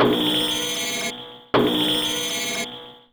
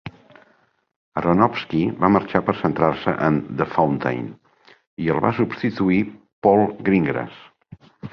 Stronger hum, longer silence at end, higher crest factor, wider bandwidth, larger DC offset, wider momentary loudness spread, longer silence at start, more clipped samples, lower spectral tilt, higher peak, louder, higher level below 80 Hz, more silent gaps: neither; about the same, 0.15 s vs 0.05 s; about the same, 16 dB vs 20 dB; first, over 20 kHz vs 6.2 kHz; neither; about the same, 11 LU vs 12 LU; about the same, 0 s vs 0.05 s; neither; second, -2.5 dB/octave vs -9 dB/octave; second, -6 dBFS vs -2 dBFS; about the same, -22 LUFS vs -20 LUFS; about the same, -54 dBFS vs -50 dBFS; second, none vs 0.96-1.12 s, 4.87-4.97 s, 6.33-6.42 s